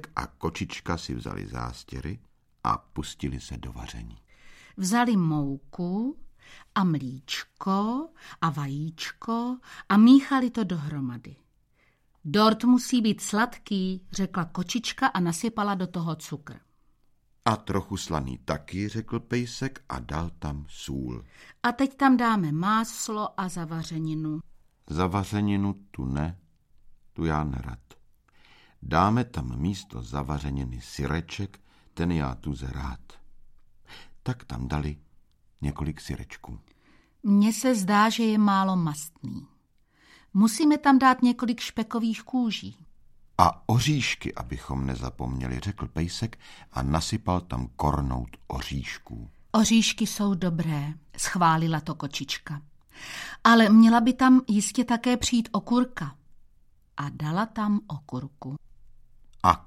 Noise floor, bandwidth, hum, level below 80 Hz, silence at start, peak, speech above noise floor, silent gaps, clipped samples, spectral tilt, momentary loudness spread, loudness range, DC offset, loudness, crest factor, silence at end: -66 dBFS; 15 kHz; none; -44 dBFS; 0.05 s; -2 dBFS; 40 dB; none; under 0.1%; -5 dB/octave; 17 LU; 11 LU; under 0.1%; -26 LUFS; 26 dB; 0.05 s